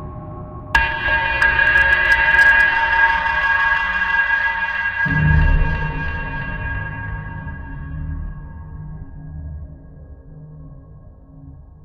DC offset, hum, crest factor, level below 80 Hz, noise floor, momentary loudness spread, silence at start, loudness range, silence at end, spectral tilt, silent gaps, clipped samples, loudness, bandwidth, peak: under 0.1%; none; 18 dB; -28 dBFS; -41 dBFS; 22 LU; 0 s; 21 LU; 0.2 s; -5.5 dB/octave; none; under 0.1%; -16 LUFS; 12.5 kHz; -2 dBFS